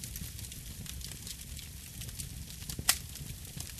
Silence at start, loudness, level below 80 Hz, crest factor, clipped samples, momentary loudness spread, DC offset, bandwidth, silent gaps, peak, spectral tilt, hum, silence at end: 0 s; -38 LUFS; -48 dBFS; 30 dB; under 0.1%; 13 LU; under 0.1%; 14.5 kHz; none; -10 dBFS; -1.5 dB/octave; none; 0 s